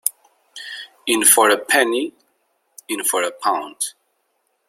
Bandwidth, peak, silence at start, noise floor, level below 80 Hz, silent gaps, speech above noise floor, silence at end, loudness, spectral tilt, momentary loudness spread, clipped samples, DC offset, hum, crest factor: 16.5 kHz; 0 dBFS; 0.05 s; -69 dBFS; -72 dBFS; none; 51 dB; 0.8 s; -17 LUFS; 0 dB/octave; 20 LU; under 0.1%; under 0.1%; none; 22 dB